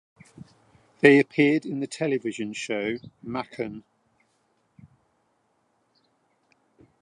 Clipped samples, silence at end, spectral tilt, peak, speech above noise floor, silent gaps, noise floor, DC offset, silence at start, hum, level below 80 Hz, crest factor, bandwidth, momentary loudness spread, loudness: under 0.1%; 3.25 s; -5.5 dB/octave; -2 dBFS; 46 dB; none; -70 dBFS; under 0.1%; 0.4 s; none; -68 dBFS; 26 dB; 10.5 kHz; 17 LU; -24 LUFS